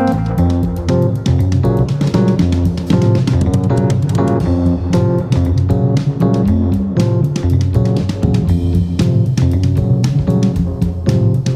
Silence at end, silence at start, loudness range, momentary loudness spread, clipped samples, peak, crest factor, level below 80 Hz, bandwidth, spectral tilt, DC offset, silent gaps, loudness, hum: 0 s; 0 s; 1 LU; 2 LU; under 0.1%; 0 dBFS; 12 dB; -26 dBFS; 11 kHz; -8.5 dB/octave; under 0.1%; none; -14 LUFS; none